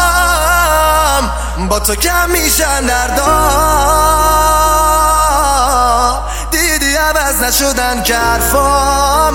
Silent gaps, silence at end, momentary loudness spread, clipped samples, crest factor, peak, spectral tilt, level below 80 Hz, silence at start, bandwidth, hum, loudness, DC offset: none; 0 s; 4 LU; under 0.1%; 12 dB; 0 dBFS; -2.5 dB/octave; -20 dBFS; 0 s; 17 kHz; none; -11 LUFS; under 0.1%